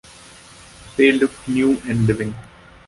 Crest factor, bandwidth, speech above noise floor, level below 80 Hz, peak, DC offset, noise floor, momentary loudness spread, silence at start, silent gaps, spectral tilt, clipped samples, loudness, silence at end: 18 dB; 11.5 kHz; 26 dB; -46 dBFS; -2 dBFS; under 0.1%; -44 dBFS; 14 LU; 0.85 s; none; -6.5 dB/octave; under 0.1%; -19 LUFS; 0.45 s